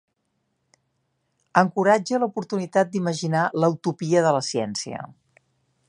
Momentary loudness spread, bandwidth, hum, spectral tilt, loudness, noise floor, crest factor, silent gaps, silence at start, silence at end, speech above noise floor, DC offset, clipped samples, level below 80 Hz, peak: 9 LU; 11 kHz; none; -5.5 dB/octave; -22 LUFS; -74 dBFS; 22 dB; none; 1.55 s; 0.8 s; 52 dB; under 0.1%; under 0.1%; -70 dBFS; -2 dBFS